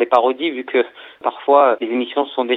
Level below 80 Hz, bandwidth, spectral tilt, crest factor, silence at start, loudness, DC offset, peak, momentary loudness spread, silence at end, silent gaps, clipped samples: -70 dBFS; 5.8 kHz; -5.5 dB/octave; 18 dB; 0 s; -18 LUFS; under 0.1%; 0 dBFS; 11 LU; 0 s; none; under 0.1%